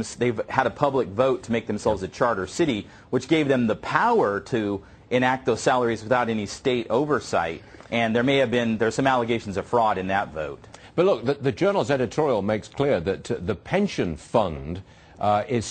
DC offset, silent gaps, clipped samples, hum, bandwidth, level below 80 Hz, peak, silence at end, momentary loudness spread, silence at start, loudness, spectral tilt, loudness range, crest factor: under 0.1%; none; under 0.1%; none; 9.2 kHz; -52 dBFS; -2 dBFS; 0 s; 8 LU; 0 s; -24 LUFS; -5.5 dB/octave; 2 LU; 22 dB